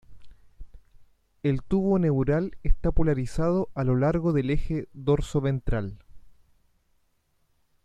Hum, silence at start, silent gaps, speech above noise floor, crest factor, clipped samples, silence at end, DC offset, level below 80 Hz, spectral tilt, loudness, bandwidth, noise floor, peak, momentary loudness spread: none; 0.1 s; none; 45 dB; 16 dB; under 0.1%; 1.55 s; under 0.1%; -34 dBFS; -8.5 dB/octave; -26 LUFS; 9.8 kHz; -69 dBFS; -10 dBFS; 8 LU